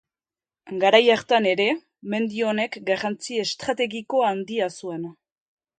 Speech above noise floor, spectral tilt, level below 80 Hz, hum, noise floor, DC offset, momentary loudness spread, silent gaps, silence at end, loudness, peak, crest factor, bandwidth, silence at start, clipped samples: over 68 dB; -4 dB/octave; -70 dBFS; none; under -90 dBFS; under 0.1%; 14 LU; none; 0.65 s; -23 LUFS; 0 dBFS; 24 dB; 9.4 kHz; 0.65 s; under 0.1%